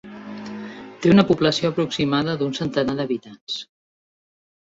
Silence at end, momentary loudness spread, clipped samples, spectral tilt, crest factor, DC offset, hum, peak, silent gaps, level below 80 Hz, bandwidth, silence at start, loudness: 1.15 s; 18 LU; under 0.1%; -6 dB/octave; 20 dB; under 0.1%; none; -2 dBFS; 3.41-3.47 s; -54 dBFS; 7.8 kHz; 0.05 s; -21 LUFS